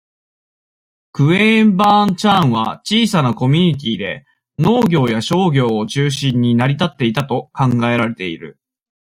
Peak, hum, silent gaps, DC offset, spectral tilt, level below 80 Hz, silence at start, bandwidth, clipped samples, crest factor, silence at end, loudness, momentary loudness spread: -2 dBFS; none; none; under 0.1%; -6 dB/octave; -52 dBFS; 1.15 s; 15.5 kHz; under 0.1%; 14 dB; 0.6 s; -15 LUFS; 11 LU